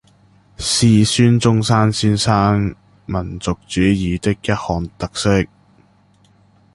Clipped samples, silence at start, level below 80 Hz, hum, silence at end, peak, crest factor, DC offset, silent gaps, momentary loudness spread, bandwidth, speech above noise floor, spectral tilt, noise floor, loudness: under 0.1%; 0.6 s; -36 dBFS; none; 1.3 s; -2 dBFS; 16 dB; under 0.1%; none; 12 LU; 11.5 kHz; 38 dB; -5.5 dB/octave; -53 dBFS; -17 LUFS